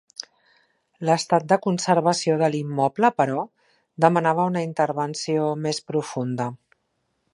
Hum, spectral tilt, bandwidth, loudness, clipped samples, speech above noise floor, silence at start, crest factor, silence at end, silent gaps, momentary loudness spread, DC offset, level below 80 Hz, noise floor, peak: none; -5.5 dB/octave; 11.5 kHz; -22 LUFS; under 0.1%; 51 dB; 1 s; 22 dB; 0.8 s; none; 9 LU; under 0.1%; -72 dBFS; -73 dBFS; -2 dBFS